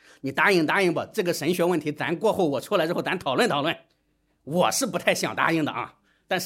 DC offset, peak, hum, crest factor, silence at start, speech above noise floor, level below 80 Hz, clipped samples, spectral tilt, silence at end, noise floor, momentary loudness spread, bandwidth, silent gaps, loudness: under 0.1%; -4 dBFS; none; 20 dB; 0.25 s; 46 dB; -68 dBFS; under 0.1%; -4 dB/octave; 0 s; -70 dBFS; 9 LU; 16.5 kHz; none; -24 LUFS